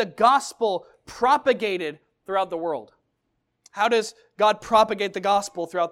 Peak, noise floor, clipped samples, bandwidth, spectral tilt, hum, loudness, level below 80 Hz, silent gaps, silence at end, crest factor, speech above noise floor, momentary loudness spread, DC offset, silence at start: -4 dBFS; -75 dBFS; under 0.1%; 15 kHz; -3.5 dB/octave; none; -23 LUFS; -62 dBFS; none; 0 s; 20 dB; 52 dB; 13 LU; under 0.1%; 0 s